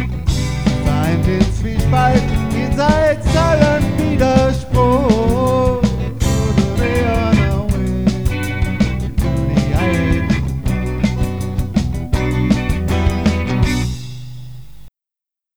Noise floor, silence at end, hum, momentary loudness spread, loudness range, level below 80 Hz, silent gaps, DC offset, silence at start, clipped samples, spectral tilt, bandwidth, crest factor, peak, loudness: -87 dBFS; 0 s; none; 7 LU; 4 LU; -22 dBFS; none; 2%; 0 s; under 0.1%; -7 dB/octave; over 20 kHz; 16 dB; 0 dBFS; -16 LUFS